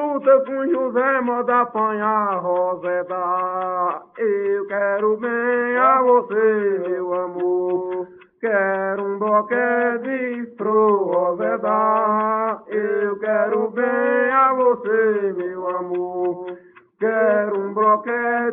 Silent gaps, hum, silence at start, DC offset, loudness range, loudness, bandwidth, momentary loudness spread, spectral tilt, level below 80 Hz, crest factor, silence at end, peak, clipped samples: none; none; 0 s; under 0.1%; 3 LU; -20 LUFS; 3.7 kHz; 8 LU; -10.5 dB/octave; -70 dBFS; 16 dB; 0 s; -4 dBFS; under 0.1%